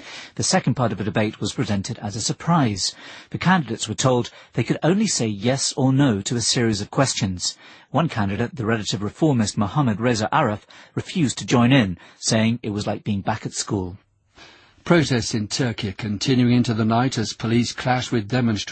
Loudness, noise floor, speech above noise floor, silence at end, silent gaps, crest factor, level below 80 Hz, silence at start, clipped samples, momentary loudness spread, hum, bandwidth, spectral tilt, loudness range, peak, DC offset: -21 LUFS; -50 dBFS; 28 dB; 0 s; none; 18 dB; -52 dBFS; 0 s; under 0.1%; 8 LU; none; 8.8 kHz; -5 dB/octave; 3 LU; -4 dBFS; under 0.1%